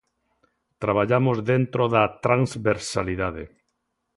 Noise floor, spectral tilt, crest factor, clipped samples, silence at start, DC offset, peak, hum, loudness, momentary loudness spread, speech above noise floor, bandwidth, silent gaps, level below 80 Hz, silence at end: -76 dBFS; -6.5 dB/octave; 20 dB; under 0.1%; 0.8 s; under 0.1%; -4 dBFS; none; -23 LUFS; 9 LU; 54 dB; 11.5 kHz; none; -50 dBFS; 0.7 s